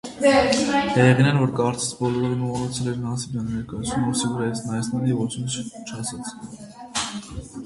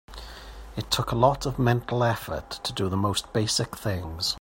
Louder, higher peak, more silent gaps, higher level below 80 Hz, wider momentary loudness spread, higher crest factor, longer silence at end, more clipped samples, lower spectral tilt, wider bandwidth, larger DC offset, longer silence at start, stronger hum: first, -23 LUFS vs -26 LUFS; about the same, -4 dBFS vs -6 dBFS; neither; about the same, -48 dBFS vs -44 dBFS; about the same, 16 LU vs 16 LU; about the same, 18 dB vs 22 dB; about the same, 0 s vs 0 s; neither; about the same, -5 dB/octave vs -4.5 dB/octave; second, 11.5 kHz vs 16.5 kHz; neither; about the same, 0.05 s vs 0.1 s; neither